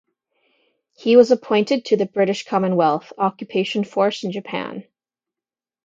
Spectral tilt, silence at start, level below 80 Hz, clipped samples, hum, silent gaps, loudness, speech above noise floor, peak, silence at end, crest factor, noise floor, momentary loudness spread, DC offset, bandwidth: -6 dB/octave; 1 s; -72 dBFS; under 0.1%; none; none; -19 LUFS; over 71 dB; 0 dBFS; 1.05 s; 20 dB; under -90 dBFS; 13 LU; under 0.1%; 7.8 kHz